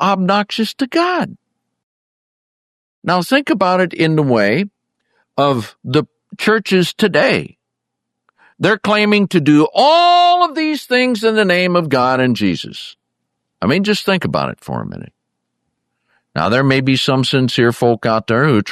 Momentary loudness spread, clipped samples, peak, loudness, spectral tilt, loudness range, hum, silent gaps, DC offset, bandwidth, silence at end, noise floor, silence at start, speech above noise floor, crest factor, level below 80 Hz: 13 LU; under 0.1%; 0 dBFS; -14 LUFS; -6 dB/octave; 7 LU; none; 1.83-3.02 s; under 0.1%; 14 kHz; 0 s; -77 dBFS; 0 s; 63 dB; 14 dB; -56 dBFS